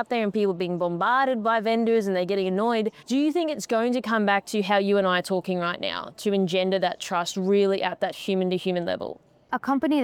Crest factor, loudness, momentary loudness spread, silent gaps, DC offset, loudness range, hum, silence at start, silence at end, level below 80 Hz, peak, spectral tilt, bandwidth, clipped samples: 16 dB; -24 LUFS; 7 LU; none; under 0.1%; 1 LU; none; 0 s; 0 s; -72 dBFS; -8 dBFS; -5.5 dB/octave; 16 kHz; under 0.1%